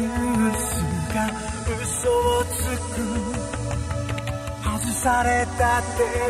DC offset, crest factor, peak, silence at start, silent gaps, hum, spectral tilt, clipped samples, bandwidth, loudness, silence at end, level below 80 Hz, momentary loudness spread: under 0.1%; 16 dB; -6 dBFS; 0 s; none; none; -4.5 dB/octave; under 0.1%; 16 kHz; -24 LUFS; 0 s; -34 dBFS; 8 LU